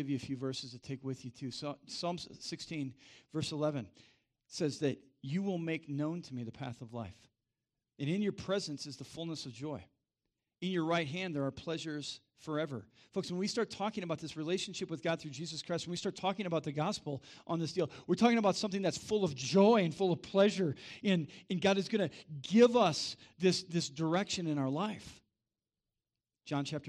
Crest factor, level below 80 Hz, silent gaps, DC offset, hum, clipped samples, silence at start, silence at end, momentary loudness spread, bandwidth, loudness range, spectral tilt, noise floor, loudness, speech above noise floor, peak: 22 dB; -72 dBFS; none; under 0.1%; none; under 0.1%; 0 s; 0 s; 14 LU; 12 kHz; 9 LU; -5.5 dB/octave; under -90 dBFS; -35 LUFS; over 55 dB; -14 dBFS